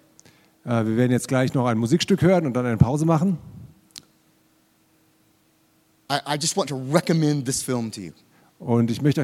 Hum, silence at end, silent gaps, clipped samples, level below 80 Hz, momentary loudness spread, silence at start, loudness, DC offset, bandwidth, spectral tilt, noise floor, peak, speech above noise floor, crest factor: none; 0 s; none; under 0.1%; -50 dBFS; 13 LU; 0.65 s; -22 LUFS; under 0.1%; 15.5 kHz; -5.5 dB/octave; -62 dBFS; -2 dBFS; 41 dB; 22 dB